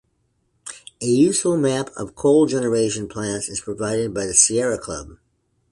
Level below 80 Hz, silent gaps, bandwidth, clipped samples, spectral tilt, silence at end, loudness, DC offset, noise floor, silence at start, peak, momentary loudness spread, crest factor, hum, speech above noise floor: -52 dBFS; none; 11.5 kHz; under 0.1%; -4 dB/octave; 0.55 s; -19 LUFS; under 0.1%; -68 dBFS; 0.65 s; 0 dBFS; 17 LU; 20 dB; none; 48 dB